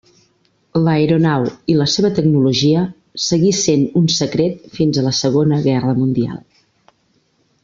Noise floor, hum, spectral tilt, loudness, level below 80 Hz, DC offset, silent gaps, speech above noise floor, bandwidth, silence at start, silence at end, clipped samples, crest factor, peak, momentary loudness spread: -61 dBFS; none; -5.5 dB/octave; -16 LUFS; -52 dBFS; under 0.1%; none; 46 dB; 7.6 kHz; 0.75 s; 1.25 s; under 0.1%; 14 dB; -2 dBFS; 7 LU